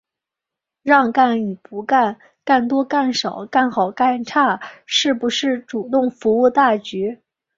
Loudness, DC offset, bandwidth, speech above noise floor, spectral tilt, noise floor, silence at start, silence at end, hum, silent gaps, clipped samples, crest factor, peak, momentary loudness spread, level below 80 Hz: -18 LUFS; under 0.1%; 7.6 kHz; 68 dB; -4 dB/octave; -85 dBFS; 0.85 s; 0.4 s; none; none; under 0.1%; 16 dB; -2 dBFS; 10 LU; -64 dBFS